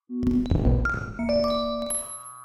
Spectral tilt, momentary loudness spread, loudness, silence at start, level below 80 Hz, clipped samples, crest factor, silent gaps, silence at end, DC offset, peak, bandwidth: -5.5 dB/octave; 6 LU; -25 LUFS; 0.1 s; -32 dBFS; under 0.1%; 16 dB; none; 0 s; under 0.1%; -10 dBFS; 14 kHz